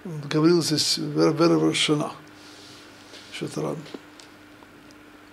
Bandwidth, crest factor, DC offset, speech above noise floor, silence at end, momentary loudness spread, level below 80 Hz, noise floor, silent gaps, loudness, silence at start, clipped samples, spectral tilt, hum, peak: 14 kHz; 18 dB; under 0.1%; 26 dB; 0.4 s; 24 LU; -66 dBFS; -48 dBFS; none; -22 LUFS; 0.05 s; under 0.1%; -4.5 dB/octave; none; -8 dBFS